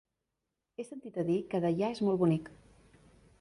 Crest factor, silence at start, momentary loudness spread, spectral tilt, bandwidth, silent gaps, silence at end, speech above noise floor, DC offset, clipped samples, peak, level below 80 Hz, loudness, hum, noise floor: 16 dB; 0.8 s; 17 LU; -8 dB/octave; 11 kHz; none; 0.85 s; 55 dB; under 0.1%; under 0.1%; -18 dBFS; -68 dBFS; -32 LUFS; none; -86 dBFS